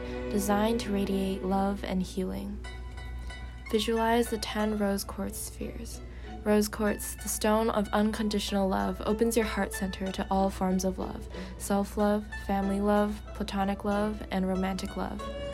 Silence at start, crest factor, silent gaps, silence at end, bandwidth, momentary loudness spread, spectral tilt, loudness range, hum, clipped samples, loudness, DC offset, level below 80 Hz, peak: 0 s; 18 dB; none; 0 s; 16 kHz; 12 LU; -5 dB/octave; 3 LU; none; under 0.1%; -30 LUFS; under 0.1%; -42 dBFS; -12 dBFS